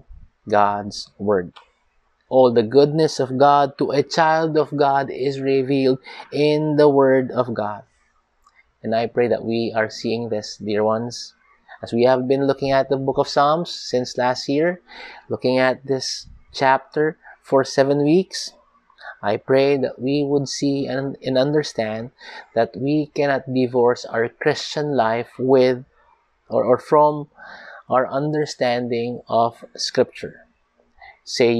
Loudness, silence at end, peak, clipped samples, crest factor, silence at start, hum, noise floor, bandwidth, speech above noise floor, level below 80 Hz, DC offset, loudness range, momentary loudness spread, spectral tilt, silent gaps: -20 LUFS; 0 s; -2 dBFS; under 0.1%; 18 dB; 0.1 s; none; -63 dBFS; 11 kHz; 44 dB; -58 dBFS; under 0.1%; 4 LU; 13 LU; -5.5 dB/octave; none